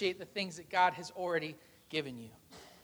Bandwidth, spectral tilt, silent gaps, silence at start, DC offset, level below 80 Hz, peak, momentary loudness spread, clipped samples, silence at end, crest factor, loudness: over 20 kHz; -4 dB/octave; none; 0 s; under 0.1%; -74 dBFS; -16 dBFS; 24 LU; under 0.1%; 0.15 s; 22 dB; -36 LUFS